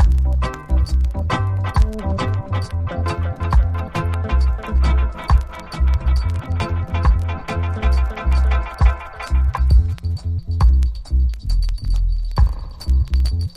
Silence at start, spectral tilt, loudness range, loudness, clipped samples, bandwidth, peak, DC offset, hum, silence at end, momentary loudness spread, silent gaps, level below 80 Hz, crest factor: 0 s; -7 dB/octave; 2 LU; -20 LUFS; under 0.1%; 9.6 kHz; -2 dBFS; under 0.1%; none; 0 s; 6 LU; none; -18 dBFS; 14 dB